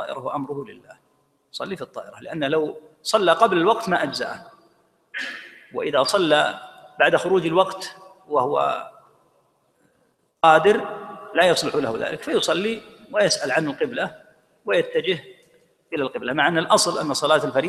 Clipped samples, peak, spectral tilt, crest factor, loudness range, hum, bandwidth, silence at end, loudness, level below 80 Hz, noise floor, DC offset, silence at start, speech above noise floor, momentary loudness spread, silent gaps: under 0.1%; 0 dBFS; -3.5 dB/octave; 22 dB; 4 LU; none; 15 kHz; 0 s; -21 LUFS; -66 dBFS; -66 dBFS; under 0.1%; 0 s; 44 dB; 16 LU; none